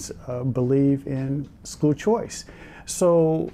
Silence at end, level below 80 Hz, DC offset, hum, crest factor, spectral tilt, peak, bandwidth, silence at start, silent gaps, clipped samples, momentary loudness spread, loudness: 0 s; -50 dBFS; under 0.1%; none; 12 dB; -6.5 dB/octave; -10 dBFS; 15 kHz; 0 s; none; under 0.1%; 17 LU; -23 LUFS